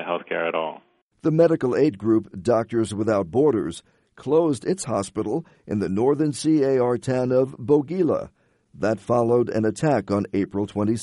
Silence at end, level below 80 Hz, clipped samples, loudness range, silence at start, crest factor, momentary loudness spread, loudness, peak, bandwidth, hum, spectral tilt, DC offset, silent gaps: 0 s; -58 dBFS; under 0.1%; 2 LU; 0 s; 18 dB; 8 LU; -23 LUFS; -4 dBFS; 11.5 kHz; none; -7 dB/octave; under 0.1%; 1.02-1.10 s